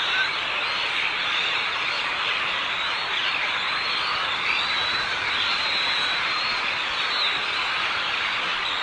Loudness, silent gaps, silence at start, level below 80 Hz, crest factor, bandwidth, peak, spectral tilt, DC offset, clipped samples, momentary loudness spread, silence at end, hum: -22 LUFS; none; 0 s; -58 dBFS; 14 dB; 11 kHz; -10 dBFS; -1 dB/octave; under 0.1%; under 0.1%; 2 LU; 0 s; none